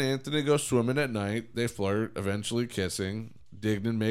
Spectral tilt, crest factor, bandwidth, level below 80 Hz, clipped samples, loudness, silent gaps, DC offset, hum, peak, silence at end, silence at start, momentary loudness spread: -5 dB/octave; 16 dB; 16 kHz; -60 dBFS; under 0.1%; -30 LUFS; none; under 0.1%; none; -12 dBFS; 0 s; 0 s; 7 LU